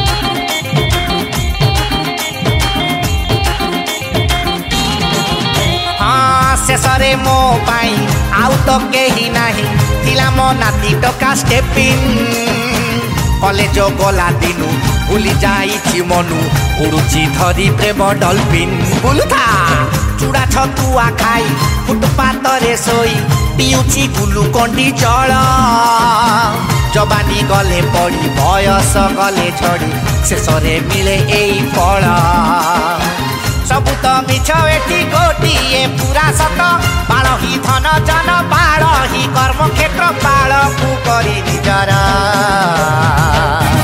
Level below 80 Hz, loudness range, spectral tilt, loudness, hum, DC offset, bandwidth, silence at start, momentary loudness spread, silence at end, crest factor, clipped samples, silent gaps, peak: -22 dBFS; 2 LU; -4.5 dB/octave; -12 LUFS; none; under 0.1%; 16.5 kHz; 0 s; 4 LU; 0 s; 12 dB; under 0.1%; none; 0 dBFS